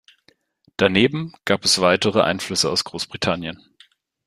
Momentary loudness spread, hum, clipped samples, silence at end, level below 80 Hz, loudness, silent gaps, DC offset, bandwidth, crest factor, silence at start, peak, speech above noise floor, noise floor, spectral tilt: 12 LU; none; under 0.1%; 0.7 s; -56 dBFS; -19 LUFS; none; under 0.1%; 15.5 kHz; 20 dB; 0.8 s; -2 dBFS; 41 dB; -61 dBFS; -3.5 dB/octave